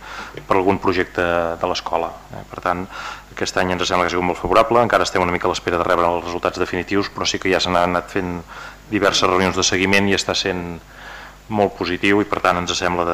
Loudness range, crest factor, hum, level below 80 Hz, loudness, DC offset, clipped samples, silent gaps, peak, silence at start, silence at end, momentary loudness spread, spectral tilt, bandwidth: 4 LU; 16 dB; none; -44 dBFS; -19 LUFS; under 0.1%; under 0.1%; none; -4 dBFS; 0 s; 0 s; 15 LU; -4 dB/octave; 16 kHz